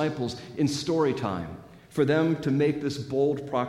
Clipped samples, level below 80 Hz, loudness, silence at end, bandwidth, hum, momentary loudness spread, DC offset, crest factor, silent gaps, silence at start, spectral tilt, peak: under 0.1%; -60 dBFS; -27 LUFS; 0 s; 13.5 kHz; none; 11 LU; under 0.1%; 16 dB; none; 0 s; -6.5 dB/octave; -12 dBFS